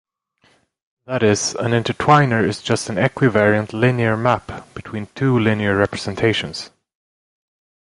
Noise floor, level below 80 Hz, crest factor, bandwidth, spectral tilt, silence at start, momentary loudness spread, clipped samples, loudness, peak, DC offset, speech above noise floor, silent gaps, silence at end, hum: -60 dBFS; -48 dBFS; 18 dB; 11.5 kHz; -5.5 dB/octave; 1.1 s; 15 LU; under 0.1%; -18 LUFS; 0 dBFS; under 0.1%; 42 dB; none; 1.25 s; none